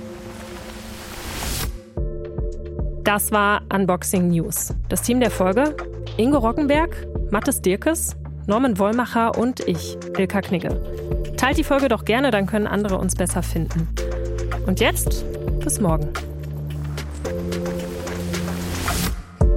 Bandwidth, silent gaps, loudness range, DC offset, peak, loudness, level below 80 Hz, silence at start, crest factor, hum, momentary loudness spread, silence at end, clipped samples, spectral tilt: 16.5 kHz; none; 5 LU; under 0.1%; -2 dBFS; -22 LUFS; -30 dBFS; 0 s; 20 dB; none; 11 LU; 0 s; under 0.1%; -5 dB/octave